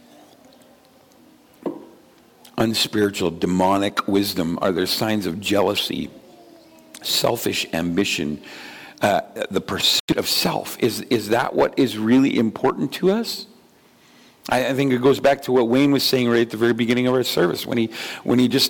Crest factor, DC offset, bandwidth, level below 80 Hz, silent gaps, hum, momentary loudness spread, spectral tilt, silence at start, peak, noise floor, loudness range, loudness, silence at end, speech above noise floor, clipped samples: 14 dB; under 0.1%; 17.5 kHz; -56 dBFS; 10.00-10.08 s; none; 12 LU; -4.5 dB/octave; 1.65 s; -8 dBFS; -53 dBFS; 5 LU; -20 LUFS; 0 s; 33 dB; under 0.1%